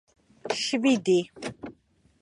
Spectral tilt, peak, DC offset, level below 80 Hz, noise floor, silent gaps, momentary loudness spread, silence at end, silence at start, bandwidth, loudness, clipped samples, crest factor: -4 dB/octave; -10 dBFS; under 0.1%; -68 dBFS; -62 dBFS; none; 21 LU; 0.5 s; 0.45 s; 11 kHz; -25 LUFS; under 0.1%; 18 dB